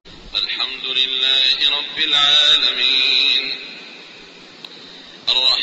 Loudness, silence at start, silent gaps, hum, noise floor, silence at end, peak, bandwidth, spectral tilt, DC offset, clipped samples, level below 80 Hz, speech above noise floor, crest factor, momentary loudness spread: -14 LUFS; 0.05 s; none; none; -41 dBFS; 0 s; -2 dBFS; 8.2 kHz; 0.5 dB/octave; under 0.1%; under 0.1%; -54 dBFS; 24 dB; 16 dB; 14 LU